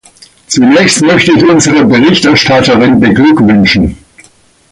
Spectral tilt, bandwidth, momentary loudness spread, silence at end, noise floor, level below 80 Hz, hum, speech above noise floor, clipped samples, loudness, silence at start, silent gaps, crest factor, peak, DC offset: -4.5 dB/octave; 11.5 kHz; 3 LU; 0.75 s; -43 dBFS; -32 dBFS; none; 38 dB; under 0.1%; -6 LUFS; 0.5 s; none; 6 dB; 0 dBFS; under 0.1%